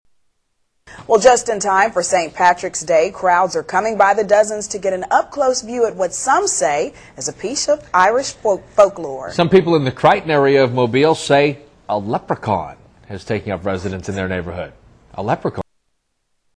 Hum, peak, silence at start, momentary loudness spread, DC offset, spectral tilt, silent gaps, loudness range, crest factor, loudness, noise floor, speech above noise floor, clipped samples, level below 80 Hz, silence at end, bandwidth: none; 0 dBFS; 0.9 s; 12 LU; under 0.1%; -4 dB/octave; none; 9 LU; 16 dB; -16 LUFS; -68 dBFS; 52 dB; under 0.1%; -50 dBFS; 0.95 s; 11 kHz